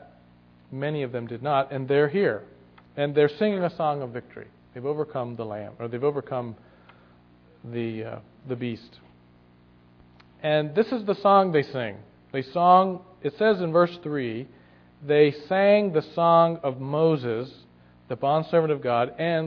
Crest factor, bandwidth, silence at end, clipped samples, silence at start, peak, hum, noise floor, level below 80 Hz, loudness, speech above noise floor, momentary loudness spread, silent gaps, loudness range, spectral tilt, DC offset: 20 dB; 5.4 kHz; 0 s; under 0.1%; 0.7 s; -6 dBFS; 60 Hz at -55 dBFS; -56 dBFS; -66 dBFS; -24 LUFS; 32 dB; 17 LU; none; 10 LU; -9 dB/octave; under 0.1%